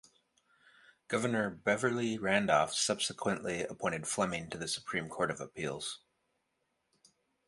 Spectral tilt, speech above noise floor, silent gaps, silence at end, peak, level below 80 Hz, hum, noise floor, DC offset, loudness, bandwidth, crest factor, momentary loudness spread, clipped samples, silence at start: -3.5 dB/octave; 47 dB; none; 1.5 s; -12 dBFS; -68 dBFS; none; -81 dBFS; under 0.1%; -34 LUFS; 11.5 kHz; 22 dB; 9 LU; under 0.1%; 1.1 s